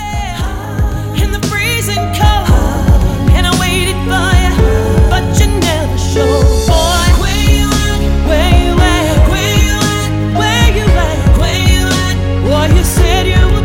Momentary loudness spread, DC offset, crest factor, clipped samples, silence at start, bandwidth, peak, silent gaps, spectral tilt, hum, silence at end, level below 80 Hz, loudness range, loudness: 4 LU; under 0.1%; 10 dB; under 0.1%; 0 s; 17 kHz; 0 dBFS; none; -5 dB/octave; none; 0 s; -14 dBFS; 1 LU; -11 LUFS